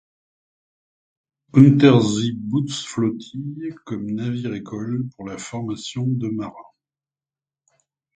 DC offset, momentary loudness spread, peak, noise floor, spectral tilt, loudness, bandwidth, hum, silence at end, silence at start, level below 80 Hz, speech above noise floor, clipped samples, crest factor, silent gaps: under 0.1%; 17 LU; 0 dBFS; under -90 dBFS; -6.5 dB/octave; -21 LUFS; 9.2 kHz; none; 1.55 s; 1.55 s; -60 dBFS; over 70 dB; under 0.1%; 22 dB; none